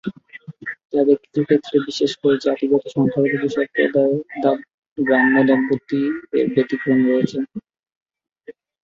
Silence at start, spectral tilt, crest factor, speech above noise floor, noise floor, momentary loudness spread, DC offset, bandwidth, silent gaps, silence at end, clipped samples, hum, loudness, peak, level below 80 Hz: 0.05 s; -6.5 dB/octave; 16 dB; 25 dB; -43 dBFS; 15 LU; under 0.1%; 7.4 kHz; 0.85-0.90 s, 4.74-4.96 s, 7.96-8.06 s; 0.35 s; under 0.1%; none; -19 LUFS; -2 dBFS; -62 dBFS